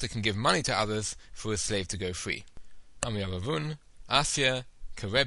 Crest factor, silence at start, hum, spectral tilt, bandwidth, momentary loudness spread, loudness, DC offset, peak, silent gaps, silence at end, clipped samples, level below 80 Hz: 24 dB; 0 s; none; -3 dB/octave; 11.5 kHz; 12 LU; -30 LUFS; under 0.1%; -6 dBFS; none; 0 s; under 0.1%; -48 dBFS